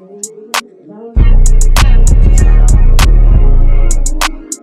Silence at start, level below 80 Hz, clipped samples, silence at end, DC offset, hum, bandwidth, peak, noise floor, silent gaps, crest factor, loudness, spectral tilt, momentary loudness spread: 0.25 s; -6 dBFS; under 0.1%; 0.05 s; under 0.1%; none; 13.5 kHz; 0 dBFS; -32 dBFS; none; 6 dB; -12 LUFS; -4.5 dB/octave; 8 LU